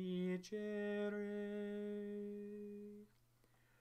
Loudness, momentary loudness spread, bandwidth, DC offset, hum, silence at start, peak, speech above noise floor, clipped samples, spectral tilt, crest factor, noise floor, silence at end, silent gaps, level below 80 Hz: -46 LUFS; 11 LU; 13 kHz; under 0.1%; none; 0 s; -34 dBFS; 30 dB; under 0.1%; -7 dB/octave; 12 dB; -74 dBFS; 0.75 s; none; -82 dBFS